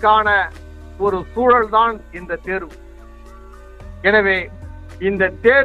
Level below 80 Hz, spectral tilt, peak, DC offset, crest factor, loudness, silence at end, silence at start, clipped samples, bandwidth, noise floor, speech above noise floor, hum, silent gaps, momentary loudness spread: -38 dBFS; -6.5 dB/octave; -2 dBFS; under 0.1%; 16 dB; -17 LUFS; 0 s; 0 s; under 0.1%; 8.8 kHz; -38 dBFS; 22 dB; none; none; 18 LU